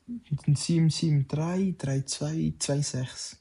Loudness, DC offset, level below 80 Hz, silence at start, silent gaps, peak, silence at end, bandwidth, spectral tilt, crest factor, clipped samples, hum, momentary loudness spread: -28 LUFS; under 0.1%; -56 dBFS; 0.1 s; none; -16 dBFS; 0.05 s; 11.5 kHz; -5.5 dB/octave; 12 dB; under 0.1%; none; 7 LU